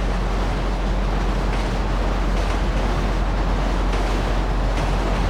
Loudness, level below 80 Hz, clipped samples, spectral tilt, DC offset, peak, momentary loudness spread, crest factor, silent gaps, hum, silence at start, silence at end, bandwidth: -23 LUFS; -22 dBFS; under 0.1%; -6 dB/octave; under 0.1%; -10 dBFS; 1 LU; 10 dB; none; none; 0 s; 0 s; 10 kHz